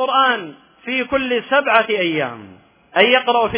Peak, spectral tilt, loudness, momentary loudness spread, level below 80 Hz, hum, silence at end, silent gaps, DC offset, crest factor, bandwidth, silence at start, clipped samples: 0 dBFS; -7.5 dB/octave; -17 LUFS; 14 LU; -54 dBFS; none; 0 s; none; under 0.1%; 18 dB; 4 kHz; 0 s; under 0.1%